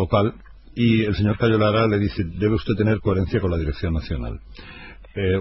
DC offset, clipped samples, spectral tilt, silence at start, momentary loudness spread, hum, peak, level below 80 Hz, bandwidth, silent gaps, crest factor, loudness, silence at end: under 0.1%; under 0.1%; -10 dB/octave; 0 s; 18 LU; none; -4 dBFS; -36 dBFS; 6 kHz; none; 16 dB; -21 LUFS; 0 s